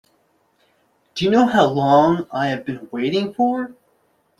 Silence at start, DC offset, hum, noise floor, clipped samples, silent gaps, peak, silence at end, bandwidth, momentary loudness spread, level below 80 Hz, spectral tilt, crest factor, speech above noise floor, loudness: 1.15 s; under 0.1%; none; -63 dBFS; under 0.1%; none; -2 dBFS; 0.7 s; 12 kHz; 13 LU; -56 dBFS; -6.5 dB/octave; 18 dB; 45 dB; -18 LUFS